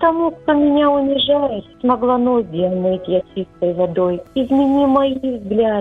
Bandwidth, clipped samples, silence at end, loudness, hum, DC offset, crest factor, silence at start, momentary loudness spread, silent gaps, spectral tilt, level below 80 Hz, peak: 4 kHz; under 0.1%; 0 s; -17 LUFS; none; under 0.1%; 14 dB; 0 s; 7 LU; none; -8.5 dB/octave; -48 dBFS; -2 dBFS